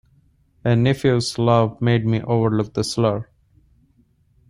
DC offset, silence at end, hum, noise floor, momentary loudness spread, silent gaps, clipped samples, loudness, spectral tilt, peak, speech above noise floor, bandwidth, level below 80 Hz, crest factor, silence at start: under 0.1%; 1.25 s; none; -59 dBFS; 5 LU; none; under 0.1%; -20 LUFS; -6.5 dB/octave; -4 dBFS; 41 dB; 11.5 kHz; -50 dBFS; 18 dB; 0.65 s